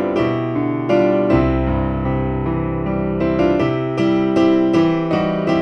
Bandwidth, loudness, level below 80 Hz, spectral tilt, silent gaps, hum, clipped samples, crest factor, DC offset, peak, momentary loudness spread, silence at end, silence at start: 6.6 kHz; -17 LUFS; -32 dBFS; -8.5 dB/octave; none; none; under 0.1%; 14 dB; under 0.1%; -2 dBFS; 6 LU; 0 s; 0 s